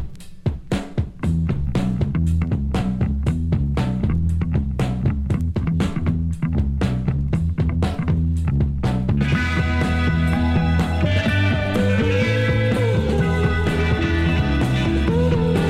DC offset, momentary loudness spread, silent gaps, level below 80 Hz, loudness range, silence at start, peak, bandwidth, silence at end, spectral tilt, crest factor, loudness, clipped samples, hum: under 0.1%; 4 LU; none; -26 dBFS; 3 LU; 0 s; -6 dBFS; 12 kHz; 0 s; -7.5 dB/octave; 12 dB; -21 LUFS; under 0.1%; none